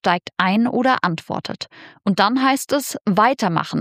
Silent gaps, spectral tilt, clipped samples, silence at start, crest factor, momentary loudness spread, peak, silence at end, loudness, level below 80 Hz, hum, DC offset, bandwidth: 3.01-3.05 s; -5 dB/octave; under 0.1%; 0.05 s; 18 dB; 11 LU; -2 dBFS; 0 s; -19 LUFS; -64 dBFS; none; under 0.1%; 15.5 kHz